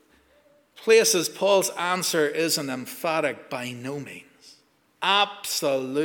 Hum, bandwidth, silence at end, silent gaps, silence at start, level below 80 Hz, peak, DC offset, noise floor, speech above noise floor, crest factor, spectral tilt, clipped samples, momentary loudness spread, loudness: none; 20 kHz; 0 s; none; 0.75 s; -78 dBFS; -6 dBFS; under 0.1%; -61 dBFS; 37 dB; 20 dB; -2.5 dB/octave; under 0.1%; 14 LU; -23 LUFS